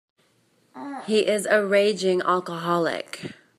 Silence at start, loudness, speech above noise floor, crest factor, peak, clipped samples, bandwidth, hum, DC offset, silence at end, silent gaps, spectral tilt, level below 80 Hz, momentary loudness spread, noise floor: 0.75 s; -22 LUFS; 41 dB; 18 dB; -6 dBFS; under 0.1%; 14 kHz; none; under 0.1%; 0.25 s; none; -4.5 dB/octave; -76 dBFS; 16 LU; -64 dBFS